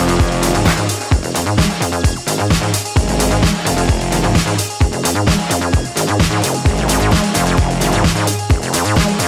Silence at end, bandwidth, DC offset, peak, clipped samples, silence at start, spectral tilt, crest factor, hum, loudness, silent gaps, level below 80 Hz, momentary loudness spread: 0 s; 16 kHz; under 0.1%; -4 dBFS; under 0.1%; 0 s; -4.5 dB/octave; 12 dB; none; -15 LUFS; none; -22 dBFS; 3 LU